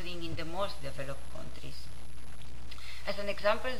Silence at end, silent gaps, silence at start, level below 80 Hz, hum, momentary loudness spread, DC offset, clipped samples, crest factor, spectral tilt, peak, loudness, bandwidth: 0 s; none; 0 s; -50 dBFS; none; 18 LU; 4%; under 0.1%; 24 dB; -4.5 dB/octave; -14 dBFS; -38 LUFS; 16 kHz